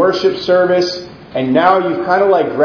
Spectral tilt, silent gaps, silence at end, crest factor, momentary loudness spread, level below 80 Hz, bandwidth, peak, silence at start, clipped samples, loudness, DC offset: -6 dB/octave; none; 0 s; 12 dB; 9 LU; -52 dBFS; 5.4 kHz; 0 dBFS; 0 s; under 0.1%; -13 LUFS; under 0.1%